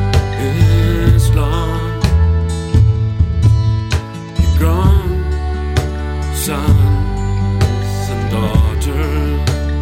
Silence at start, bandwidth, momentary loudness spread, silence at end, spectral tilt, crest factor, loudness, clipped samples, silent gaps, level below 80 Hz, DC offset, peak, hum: 0 s; 16.5 kHz; 7 LU; 0 s; -6.5 dB/octave; 14 dB; -15 LUFS; under 0.1%; none; -18 dBFS; under 0.1%; 0 dBFS; none